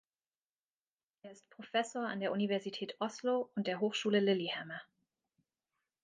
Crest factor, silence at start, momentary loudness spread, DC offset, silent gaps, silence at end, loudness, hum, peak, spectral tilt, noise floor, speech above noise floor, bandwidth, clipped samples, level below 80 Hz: 18 dB; 1.25 s; 18 LU; under 0.1%; none; 1.2 s; -36 LUFS; none; -20 dBFS; -5 dB/octave; under -90 dBFS; over 54 dB; 9.6 kHz; under 0.1%; -88 dBFS